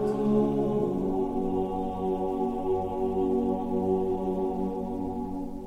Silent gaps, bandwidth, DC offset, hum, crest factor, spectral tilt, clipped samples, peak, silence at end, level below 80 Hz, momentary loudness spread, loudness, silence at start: none; 10.5 kHz; under 0.1%; none; 14 dB; -9.5 dB/octave; under 0.1%; -12 dBFS; 0 s; -46 dBFS; 7 LU; -29 LUFS; 0 s